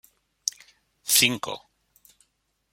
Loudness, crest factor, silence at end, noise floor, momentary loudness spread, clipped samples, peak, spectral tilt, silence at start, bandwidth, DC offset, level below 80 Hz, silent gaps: -23 LUFS; 28 dB; 1.15 s; -73 dBFS; 18 LU; under 0.1%; -2 dBFS; -0.5 dB/octave; 0.45 s; 16.5 kHz; under 0.1%; -68 dBFS; none